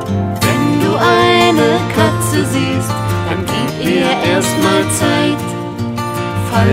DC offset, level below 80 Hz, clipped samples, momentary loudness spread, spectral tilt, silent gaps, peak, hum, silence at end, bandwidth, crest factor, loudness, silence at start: under 0.1%; -40 dBFS; under 0.1%; 9 LU; -5 dB/octave; none; 0 dBFS; none; 0 s; 16.5 kHz; 14 dB; -14 LUFS; 0 s